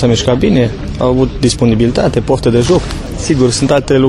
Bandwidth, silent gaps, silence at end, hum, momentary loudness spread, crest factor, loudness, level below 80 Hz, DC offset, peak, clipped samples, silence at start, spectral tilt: 12 kHz; none; 0 s; none; 5 LU; 10 dB; -12 LUFS; -26 dBFS; under 0.1%; 0 dBFS; under 0.1%; 0 s; -6 dB/octave